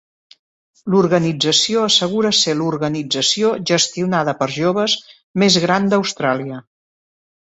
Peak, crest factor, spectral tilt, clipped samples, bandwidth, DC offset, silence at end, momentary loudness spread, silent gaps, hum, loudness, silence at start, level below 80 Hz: -2 dBFS; 16 dB; -3.5 dB/octave; under 0.1%; 8.2 kHz; under 0.1%; 0.85 s; 8 LU; 5.24-5.34 s; none; -16 LUFS; 0.85 s; -58 dBFS